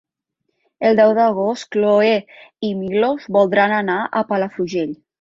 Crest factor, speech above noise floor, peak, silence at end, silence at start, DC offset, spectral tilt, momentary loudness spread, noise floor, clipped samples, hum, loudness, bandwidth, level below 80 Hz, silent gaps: 16 dB; 57 dB; -2 dBFS; 0.25 s; 0.8 s; under 0.1%; -6 dB/octave; 10 LU; -74 dBFS; under 0.1%; none; -17 LUFS; 7.6 kHz; -62 dBFS; none